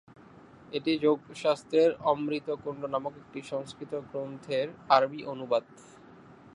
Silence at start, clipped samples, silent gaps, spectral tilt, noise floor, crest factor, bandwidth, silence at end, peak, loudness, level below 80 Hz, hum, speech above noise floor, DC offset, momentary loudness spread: 0.7 s; under 0.1%; none; -5.5 dB/octave; -53 dBFS; 24 dB; 11 kHz; 0.05 s; -8 dBFS; -30 LUFS; -70 dBFS; none; 24 dB; under 0.1%; 13 LU